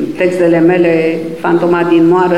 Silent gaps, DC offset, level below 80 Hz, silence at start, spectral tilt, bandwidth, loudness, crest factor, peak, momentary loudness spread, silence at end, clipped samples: none; 1%; -52 dBFS; 0 s; -7.5 dB/octave; 10.5 kHz; -11 LUFS; 10 dB; 0 dBFS; 5 LU; 0 s; under 0.1%